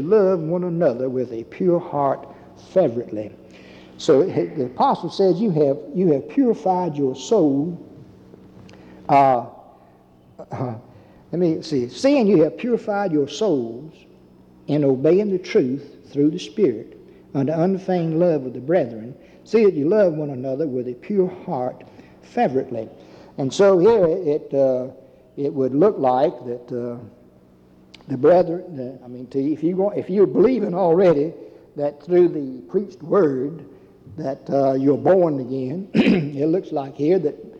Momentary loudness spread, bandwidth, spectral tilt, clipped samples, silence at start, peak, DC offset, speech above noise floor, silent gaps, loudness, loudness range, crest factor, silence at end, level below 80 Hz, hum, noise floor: 14 LU; 8.6 kHz; -7.5 dB/octave; under 0.1%; 0 s; -4 dBFS; under 0.1%; 32 dB; none; -20 LUFS; 4 LU; 16 dB; 0 s; -60 dBFS; none; -51 dBFS